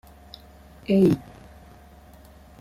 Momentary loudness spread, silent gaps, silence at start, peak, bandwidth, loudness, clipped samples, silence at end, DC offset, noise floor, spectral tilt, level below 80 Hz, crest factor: 26 LU; none; 0.9 s; -8 dBFS; 14.5 kHz; -22 LUFS; under 0.1%; 1.45 s; under 0.1%; -49 dBFS; -8.5 dB/octave; -52 dBFS; 20 dB